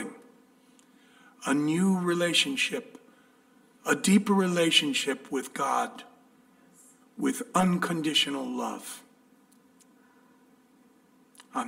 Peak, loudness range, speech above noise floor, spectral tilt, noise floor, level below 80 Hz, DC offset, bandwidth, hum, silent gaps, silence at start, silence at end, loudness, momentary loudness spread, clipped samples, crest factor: -8 dBFS; 6 LU; 34 dB; -4 dB/octave; -61 dBFS; -72 dBFS; under 0.1%; 16 kHz; none; none; 0 s; 0 s; -27 LUFS; 15 LU; under 0.1%; 22 dB